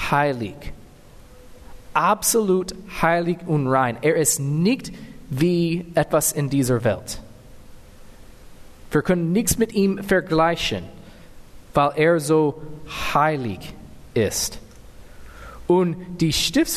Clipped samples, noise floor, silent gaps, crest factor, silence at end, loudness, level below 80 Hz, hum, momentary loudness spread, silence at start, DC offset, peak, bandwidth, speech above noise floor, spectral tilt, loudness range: under 0.1%; -45 dBFS; none; 18 dB; 0 s; -21 LUFS; -44 dBFS; none; 16 LU; 0 s; under 0.1%; -4 dBFS; 13.5 kHz; 24 dB; -4.5 dB/octave; 4 LU